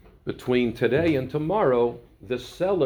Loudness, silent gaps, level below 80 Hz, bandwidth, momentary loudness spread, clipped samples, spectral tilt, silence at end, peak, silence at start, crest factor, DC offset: -24 LUFS; none; -50 dBFS; 19.5 kHz; 11 LU; under 0.1%; -7.5 dB/octave; 0 s; -8 dBFS; 0.25 s; 16 dB; under 0.1%